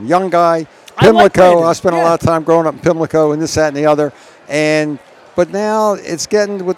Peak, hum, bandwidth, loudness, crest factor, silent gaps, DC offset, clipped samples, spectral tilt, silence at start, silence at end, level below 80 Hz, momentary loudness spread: 0 dBFS; none; 15.5 kHz; -13 LUFS; 12 dB; none; under 0.1%; 0.4%; -5.5 dB/octave; 0 s; 0 s; -44 dBFS; 11 LU